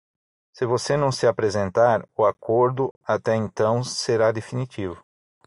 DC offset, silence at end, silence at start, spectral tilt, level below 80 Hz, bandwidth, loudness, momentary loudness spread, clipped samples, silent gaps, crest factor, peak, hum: under 0.1%; 0.5 s; 0.55 s; -5.5 dB/octave; -60 dBFS; 11.5 kHz; -22 LUFS; 10 LU; under 0.1%; 2.91-3.01 s; 18 dB; -6 dBFS; none